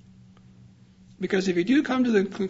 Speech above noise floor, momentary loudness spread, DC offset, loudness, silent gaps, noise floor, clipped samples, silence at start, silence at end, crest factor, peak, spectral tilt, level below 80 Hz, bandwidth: 30 dB; 5 LU; under 0.1%; -24 LUFS; none; -53 dBFS; under 0.1%; 1.2 s; 0 s; 16 dB; -10 dBFS; -6 dB/octave; -64 dBFS; 8 kHz